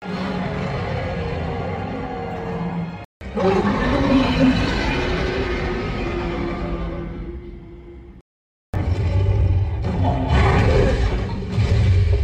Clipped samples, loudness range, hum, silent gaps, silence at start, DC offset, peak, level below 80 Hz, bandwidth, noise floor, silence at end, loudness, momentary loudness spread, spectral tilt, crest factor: under 0.1%; 7 LU; none; 3.05-3.20 s, 8.21-8.73 s; 0 s; under 0.1%; -4 dBFS; -26 dBFS; 8.8 kHz; under -90 dBFS; 0 s; -21 LUFS; 13 LU; -7.5 dB/octave; 16 dB